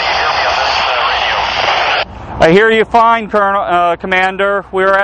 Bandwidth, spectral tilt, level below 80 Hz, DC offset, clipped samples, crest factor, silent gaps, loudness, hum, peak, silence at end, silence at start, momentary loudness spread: 9.4 kHz; -4 dB/octave; -36 dBFS; under 0.1%; under 0.1%; 12 dB; none; -11 LUFS; none; 0 dBFS; 0 s; 0 s; 5 LU